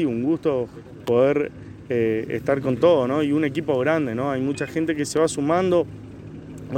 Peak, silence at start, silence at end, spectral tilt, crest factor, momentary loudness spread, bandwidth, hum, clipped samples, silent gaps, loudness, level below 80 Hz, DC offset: -6 dBFS; 0 s; 0 s; -6 dB/octave; 18 dB; 15 LU; 15.5 kHz; none; under 0.1%; none; -22 LUFS; -54 dBFS; under 0.1%